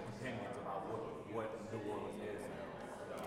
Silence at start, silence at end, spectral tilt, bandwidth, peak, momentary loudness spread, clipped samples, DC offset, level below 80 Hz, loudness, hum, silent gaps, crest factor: 0 s; 0 s; -6 dB/octave; 16 kHz; -30 dBFS; 4 LU; under 0.1%; under 0.1%; -70 dBFS; -45 LUFS; none; none; 16 dB